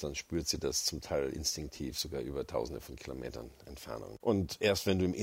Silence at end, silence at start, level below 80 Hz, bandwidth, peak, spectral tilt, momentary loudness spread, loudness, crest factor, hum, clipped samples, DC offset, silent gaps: 0 s; 0 s; -52 dBFS; 16 kHz; -14 dBFS; -4 dB/octave; 14 LU; -35 LUFS; 20 dB; none; under 0.1%; under 0.1%; none